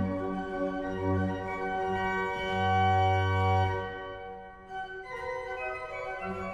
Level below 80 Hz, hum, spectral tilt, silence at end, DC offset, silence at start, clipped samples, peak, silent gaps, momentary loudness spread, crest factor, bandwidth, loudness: -54 dBFS; none; -7 dB/octave; 0 s; under 0.1%; 0 s; under 0.1%; -16 dBFS; none; 14 LU; 14 dB; 8 kHz; -31 LUFS